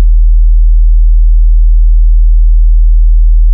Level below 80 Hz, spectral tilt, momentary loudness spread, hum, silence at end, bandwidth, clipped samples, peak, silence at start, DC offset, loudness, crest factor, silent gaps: -4 dBFS; -25.5 dB/octave; 0 LU; none; 0 s; 0.1 kHz; under 0.1%; 0 dBFS; 0 s; under 0.1%; -10 LUFS; 4 dB; none